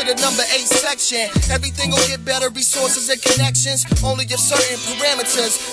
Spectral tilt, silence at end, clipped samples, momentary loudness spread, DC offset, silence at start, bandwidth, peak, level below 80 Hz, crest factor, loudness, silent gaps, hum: -2 dB/octave; 0 s; under 0.1%; 4 LU; under 0.1%; 0 s; 11 kHz; 0 dBFS; -32 dBFS; 16 dB; -16 LUFS; none; none